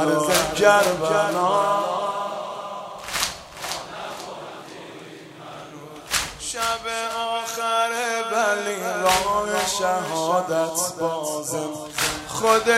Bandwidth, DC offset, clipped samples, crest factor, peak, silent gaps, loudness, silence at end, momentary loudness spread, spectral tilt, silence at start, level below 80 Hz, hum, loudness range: 16 kHz; under 0.1%; under 0.1%; 22 dB; -2 dBFS; none; -23 LUFS; 0 s; 19 LU; -2.5 dB/octave; 0 s; -52 dBFS; none; 9 LU